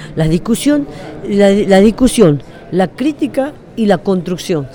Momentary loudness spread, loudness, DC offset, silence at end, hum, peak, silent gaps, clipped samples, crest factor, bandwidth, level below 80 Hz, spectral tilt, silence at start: 11 LU; -13 LUFS; under 0.1%; 0 s; none; 0 dBFS; none; 0.1%; 12 dB; 19 kHz; -34 dBFS; -6 dB/octave; 0 s